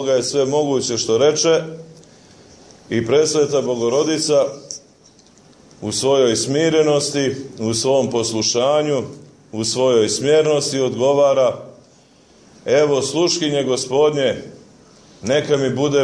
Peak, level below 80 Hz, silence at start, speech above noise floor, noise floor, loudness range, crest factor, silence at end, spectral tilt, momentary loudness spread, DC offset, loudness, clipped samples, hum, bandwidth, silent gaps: -4 dBFS; -58 dBFS; 0 s; 33 dB; -50 dBFS; 2 LU; 14 dB; 0 s; -4 dB/octave; 9 LU; under 0.1%; -17 LUFS; under 0.1%; none; 11 kHz; none